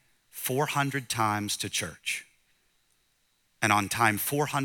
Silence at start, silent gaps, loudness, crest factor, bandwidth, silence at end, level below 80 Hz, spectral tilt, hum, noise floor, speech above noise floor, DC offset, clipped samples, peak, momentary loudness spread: 0.35 s; none; -28 LUFS; 24 dB; 19 kHz; 0 s; -68 dBFS; -3.5 dB/octave; none; -71 dBFS; 43 dB; under 0.1%; under 0.1%; -6 dBFS; 8 LU